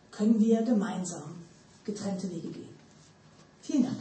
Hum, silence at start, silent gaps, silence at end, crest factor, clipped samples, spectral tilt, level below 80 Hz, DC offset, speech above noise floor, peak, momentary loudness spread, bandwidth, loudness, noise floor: none; 0.1 s; none; 0 s; 18 dB; under 0.1%; -6.5 dB/octave; -74 dBFS; under 0.1%; 29 dB; -14 dBFS; 21 LU; 8.8 kHz; -29 LUFS; -57 dBFS